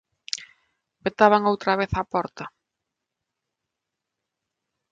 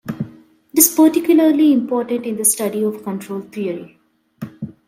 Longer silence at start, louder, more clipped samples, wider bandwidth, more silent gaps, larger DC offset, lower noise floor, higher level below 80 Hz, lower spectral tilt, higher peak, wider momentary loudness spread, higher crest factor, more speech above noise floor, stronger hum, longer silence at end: first, 0.35 s vs 0.05 s; second, -23 LUFS vs -16 LUFS; neither; second, 9.4 kHz vs 16.5 kHz; neither; neither; first, -84 dBFS vs -43 dBFS; first, -52 dBFS vs -64 dBFS; about the same, -5 dB/octave vs -4 dB/octave; about the same, -2 dBFS vs 0 dBFS; second, 16 LU vs 19 LU; first, 24 dB vs 18 dB; first, 62 dB vs 27 dB; neither; first, 2.45 s vs 0.15 s